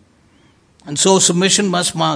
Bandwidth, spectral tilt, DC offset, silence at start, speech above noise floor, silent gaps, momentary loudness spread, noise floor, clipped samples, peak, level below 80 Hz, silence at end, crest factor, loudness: 10.5 kHz; -3 dB/octave; under 0.1%; 0.85 s; 38 dB; none; 6 LU; -52 dBFS; under 0.1%; 0 dBFS; -58 dBFS; 0 s; 16 dB; -13 LUFS